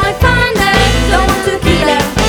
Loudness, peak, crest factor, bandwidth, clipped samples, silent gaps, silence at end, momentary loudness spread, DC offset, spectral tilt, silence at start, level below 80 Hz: -11 LUFS; 0 dBFS; 10 dB; over 20 kHz; under 0.1%; none; 0 s; 3 LU; under 0.1%; -4.5 dB/octave; 0 s; -18 dBFS